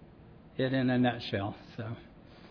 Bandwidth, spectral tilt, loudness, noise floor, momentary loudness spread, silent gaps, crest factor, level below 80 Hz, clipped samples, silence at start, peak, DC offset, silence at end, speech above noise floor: 5.4 kHz; -8.5 dB/octave; -32 LUFS; -54 dBFS; 15 LU; none; 18 dB; -62 dBFS; under 0.1%; 0 s; -16 dBFS; under 0.1%; 0 s; 23 dB